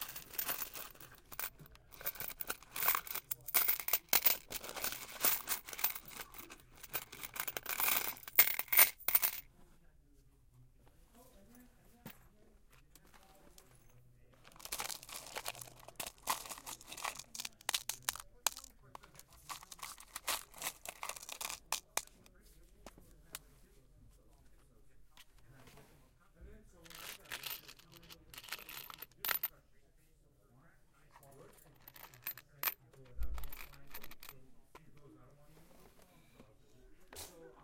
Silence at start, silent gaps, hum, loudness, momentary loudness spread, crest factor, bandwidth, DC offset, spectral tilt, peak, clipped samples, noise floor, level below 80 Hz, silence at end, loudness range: 0 s; none; none; -36 LUFS; 24 LU; 34 dB; 17 kHz; under 0.1%; 0 dB/octave; -8 dBFS; under 0.1%; -68 dBFS; -62 dBFS; 0 s; 19 LU